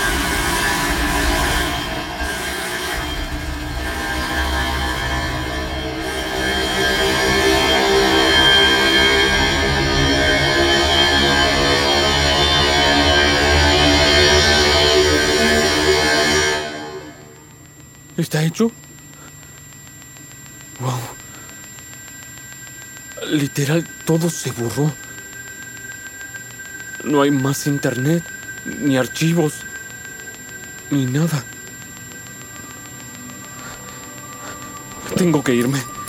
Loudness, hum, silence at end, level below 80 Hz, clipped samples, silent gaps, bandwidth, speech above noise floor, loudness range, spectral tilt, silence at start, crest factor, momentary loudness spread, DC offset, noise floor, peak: -16 LUFS; none; 0 s; -30 dBFS; under 0.1%; none; 17 kHz; 23 dB; 14 LU; -3.5 dB/octave; 0 s; 16 dB; 21 LU; under 0.1%; -42 dBFS; -2 dBFS